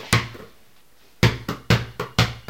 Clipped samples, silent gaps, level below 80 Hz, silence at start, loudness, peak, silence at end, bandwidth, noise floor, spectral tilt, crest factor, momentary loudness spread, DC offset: under 0.1%; none; -38 dBFS; 0 s; -22 LUFS; 0 dBFS; 0.1 s; 17 kHz; -57 dBFS; -4.5 dB/octave; 24 dB; 12 LU; 0.3%